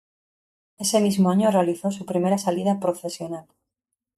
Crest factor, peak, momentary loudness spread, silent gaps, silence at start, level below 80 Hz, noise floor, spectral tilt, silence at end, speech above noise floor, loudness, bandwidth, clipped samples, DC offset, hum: 18 dB; -6 dBFS; 12 LU; none; 0.8 s; -66 dBFS; -83 dBFS; -5.5 dB/octave; 0.75 s; 61 dB; -23 LUFS; 14.5 kHz; under 0.1%; under 0.1%; none